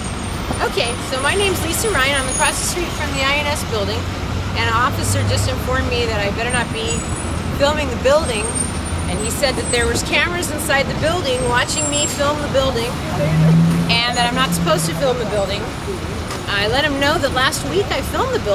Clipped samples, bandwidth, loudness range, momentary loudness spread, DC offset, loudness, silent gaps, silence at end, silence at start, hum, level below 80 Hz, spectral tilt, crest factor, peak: under 0.1%; 16 kHz; 2 LU; 6 LU; under 0.1%; -18 LUFS; none; 0 s; 0 s; none; -30 dBFS; -4 dB/octave; 16 dB; -2 dBFS